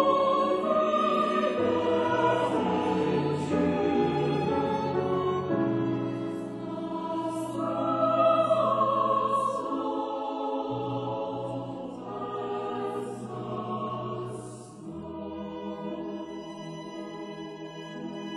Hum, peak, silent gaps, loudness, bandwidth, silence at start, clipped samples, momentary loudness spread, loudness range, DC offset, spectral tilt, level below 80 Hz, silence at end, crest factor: none; -10 dBFS; none; -28 LUFS; 12 kHz; 0 s; under 0.1%; 14 LU; 11 LU; under 0.1%; -7 dB/octave; -60 dBFS; 0 s; 18 dB